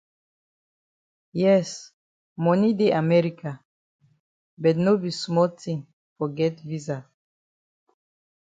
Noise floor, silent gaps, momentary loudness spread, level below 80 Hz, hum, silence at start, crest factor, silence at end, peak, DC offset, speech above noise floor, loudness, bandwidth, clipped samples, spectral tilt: under -90 dBFS; 1.93-2.36 s, 3.65-3.99 s, 4.20-4.57 s, 5.93-6.16 s; 15 LU; -70 dBFS; none; 1.35 s; 18 dB; 1.45 s; -8 dBFS; under 0.1%; over 68 dB; -24 LUFS; 9.2 kHz; under 0.1%; -7 dB/octave